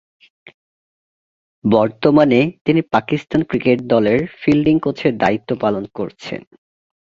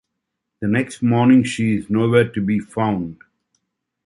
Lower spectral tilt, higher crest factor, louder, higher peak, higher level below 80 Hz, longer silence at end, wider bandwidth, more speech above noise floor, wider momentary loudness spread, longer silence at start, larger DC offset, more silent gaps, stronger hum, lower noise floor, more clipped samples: about the same, -8 dB/octave vs -7 dB/octave; about the same, 16 dB vs 18 dB; about the same, -17 LUFS vs -18 LUFS; about the same, -2 dBFS vs -2 dBFS; about the same, -50 dBFS vs -52 dBFS; second, 0.65 s vs 0.9 s; second, 7.4 kHz vs 11.5 kHz; first, over 74 dB vs 61 dB; first, 12 LU vs 9 LU; first, 1.65 s vs 0.6 s; neither; first, 2.61-2.65 s vs none; neither; first, under -90 dBFS vs -78 dBFS; neither